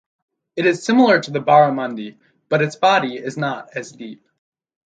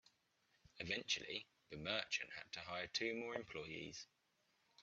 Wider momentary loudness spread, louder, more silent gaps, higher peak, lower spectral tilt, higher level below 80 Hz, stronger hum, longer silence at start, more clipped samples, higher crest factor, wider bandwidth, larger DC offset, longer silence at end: first, 19 LU vs 11 LU; first, -17 LUFS vs -45 LUFS; neither; first, 0 dBFS vs -24 dBFS; first, -5.5 dB/octave vs -2.5 dB/octave; first, -70 dBFS vs -78 dBFS; neither; second, 0.55 s vs 0.75 s; neither; second, 18 dB vs 24 dB; first, 9.2 kHz vs 8.2 kHz; neither; first, 0.75 s vs 0 s